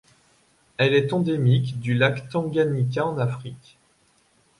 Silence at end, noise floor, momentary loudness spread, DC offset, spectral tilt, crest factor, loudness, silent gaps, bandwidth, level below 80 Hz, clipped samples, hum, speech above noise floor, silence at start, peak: 1 s; -62 dBFS; 8 LU; under 0.1%; -7.5 dB/octave; 18 dB; -23 LUFS; none; 11 kHz; -60 dBFS; under 0.1%; none; 40 dB; 0.8 s; -6 dBFS